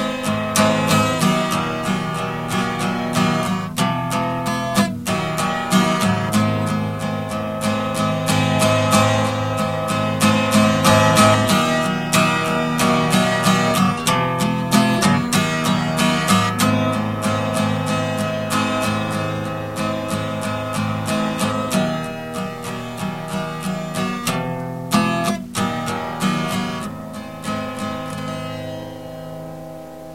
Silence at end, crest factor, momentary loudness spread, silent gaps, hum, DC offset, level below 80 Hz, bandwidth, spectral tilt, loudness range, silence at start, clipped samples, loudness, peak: 0 s; 20 dB; 11 LU; none; none; 0.3%; -48 dBFS; 16.5 kHz; -4.5 dB/octave; 8 LU; 0 s; under 0.1%; -19 LUFS; 0 dBFS